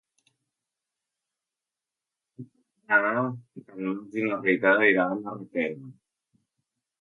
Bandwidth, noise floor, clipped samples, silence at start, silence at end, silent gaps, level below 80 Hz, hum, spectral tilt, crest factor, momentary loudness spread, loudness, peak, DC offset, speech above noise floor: 6.8 kHz; -89 dBFS; under 0.1%; 2.4 s; 1.1 s; none; -80 dBFS; none; -8 dB/octave; 22 dB; 15 LU; -25 LUFS; -6 dBFS; under 0.1%; 64 dB